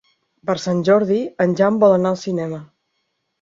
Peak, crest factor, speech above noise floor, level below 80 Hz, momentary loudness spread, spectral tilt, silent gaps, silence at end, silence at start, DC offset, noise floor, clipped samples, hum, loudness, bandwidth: -2 dBFS; 16 dB; 55 dB; -62 dBFS; 13 LU; -7 dB/octave; none; 0.75 s; 0.45 s; under 0.1%; -72 dBFS; under 0.1%; none; -18 LUFS; 7.6 kHz